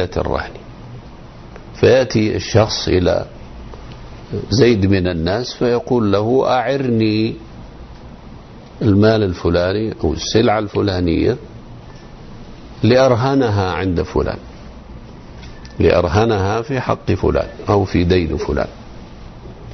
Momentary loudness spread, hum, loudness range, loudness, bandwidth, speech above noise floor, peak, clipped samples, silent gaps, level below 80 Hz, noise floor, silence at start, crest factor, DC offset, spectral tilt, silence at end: 24 LU; none; 2 LU; -16 LUFS; 6.4 kHz; 21 dB; -2 dBFS; under 0.1%; none; -34 dBFS; -36 dBFS; 0 s; 14 dB; under 0.1%; -6.5 dB/octave; 0 s